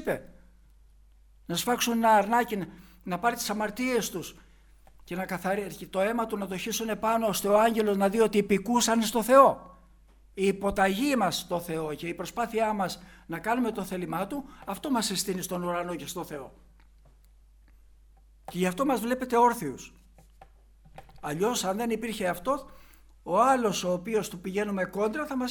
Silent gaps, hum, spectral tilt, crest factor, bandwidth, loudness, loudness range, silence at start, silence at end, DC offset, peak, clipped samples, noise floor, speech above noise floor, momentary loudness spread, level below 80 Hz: none; none; -4 dB/octave; 22 dB; over 20 kHz; -27 LUFS; 8 LU; 0 s; 0 s; under 0.1%; -6 dBFS; under 0.1%; -57 dBFS; 30 dB; 14 LU; -56 dBFS